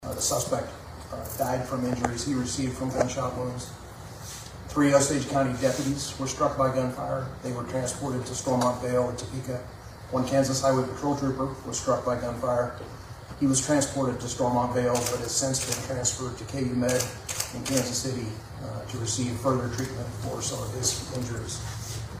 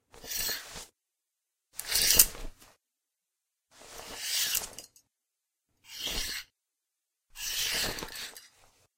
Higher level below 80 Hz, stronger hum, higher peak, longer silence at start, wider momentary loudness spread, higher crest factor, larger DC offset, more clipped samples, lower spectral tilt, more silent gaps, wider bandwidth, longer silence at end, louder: about the same, -48 dBFS vs -50 dBFS; neither; second, -6 dBFS vs -2 dBFS; second, 0 s vs 0.15 s; second, 12 LU vs 24 LU; second, 22 dB vs 32 dB; neither; neither; first, -4.5 dB/octave vs 0.5 dB/octave; neither; about the same, 15.5 kHz vs 16.5 kHz; second, 0 s vs 0.5 s; about the same, -28 LUFS vs -28 LUFS